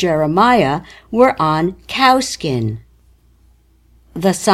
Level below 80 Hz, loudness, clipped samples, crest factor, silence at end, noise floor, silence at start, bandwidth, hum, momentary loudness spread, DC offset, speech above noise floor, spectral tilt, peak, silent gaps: -46 dBFS; -15 LUFS; under 0.1%; 16 dB; 0 s; -51 dBFS; 0 s; 16 kHz; none; 12 LU; under 0.1%; 37 dB; -5 dB/octave; 0 dBFS; none